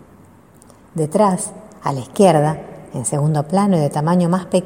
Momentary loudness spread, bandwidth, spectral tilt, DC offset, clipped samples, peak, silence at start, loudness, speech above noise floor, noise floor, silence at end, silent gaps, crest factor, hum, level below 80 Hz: 13 LU; 16 kHz; -6.5 dB/octave; under 0.1%; under 0.1%; 0 dBFS; 0.95 s; -17 LUFS; 30 dB; -46 dBFS; 0 s; none; 18 dB; none; -54 dBFS